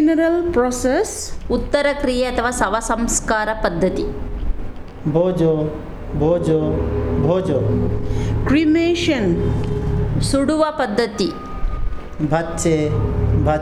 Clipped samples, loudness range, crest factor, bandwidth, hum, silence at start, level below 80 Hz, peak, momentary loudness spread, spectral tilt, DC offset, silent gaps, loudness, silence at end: under 0.1%; 2 LU; 16 dB; 13.5 kHz; none; 0 s; -28 dBFS; -2 dBFS; 11 LU; -5.5 dB/octave; under 0.1%; none; -19 LUFS; 0 s